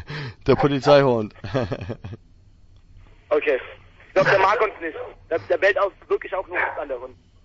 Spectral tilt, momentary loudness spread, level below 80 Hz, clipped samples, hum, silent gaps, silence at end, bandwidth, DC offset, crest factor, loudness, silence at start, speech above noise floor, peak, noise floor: -6.5 dB/octave; 17 LU; -48 dBFS; under 0.1%; none; none; 0.3 s; 8 kHz; under 0.1%; 20 dB; -21 LUFS; 0 s; 29 dB; -2 dBFS; -50 dBFS